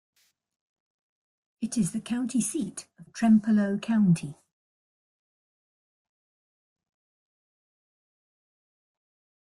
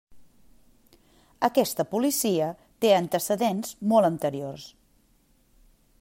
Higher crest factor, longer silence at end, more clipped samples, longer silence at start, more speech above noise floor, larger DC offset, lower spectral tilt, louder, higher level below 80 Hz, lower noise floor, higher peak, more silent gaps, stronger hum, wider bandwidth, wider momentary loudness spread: about the same, 18 dB vs 20 dB; first, 5.1 s vs 1.3 s; neither; first, 1.6 s vs 0.1 s; first, over 65 dB vs 39 dB; neither; first, -6 dB/octave vs -4.5 dB/octave; about the same, -26 LUFS vs -25 LUFS; about the same, -68 dBFS vs -64 dBFS; first, under -90 dBFS vs -63 dBFS; second, -12 dBFS vs -8 dBFS; neither; neither; second, 12.5 kHz vs 16 kHz; first, 15 LU vs 12 LU